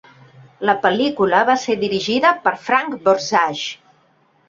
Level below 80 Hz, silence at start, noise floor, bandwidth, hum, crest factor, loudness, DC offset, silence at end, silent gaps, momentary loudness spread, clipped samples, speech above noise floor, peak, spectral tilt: -60 dBFS; 0.6 s; -58 dBFS; 7.6 kHz; none; 18 dB; -18 LUFS; under 0.1%; 0.75 s; none; 7 LU; under 0.1%; 40 dB; -2 dBFS; -4 dB/octave